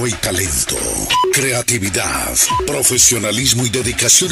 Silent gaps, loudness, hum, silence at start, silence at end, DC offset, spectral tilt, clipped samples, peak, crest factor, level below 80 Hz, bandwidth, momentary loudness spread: none; -14 LUFS; none; 0 s; 0 s; under 0.1%; -2 dB/octave; under 0.1%; -2 dBFS; 14 dB; -36 dBFS; 16 kHz; 7 LU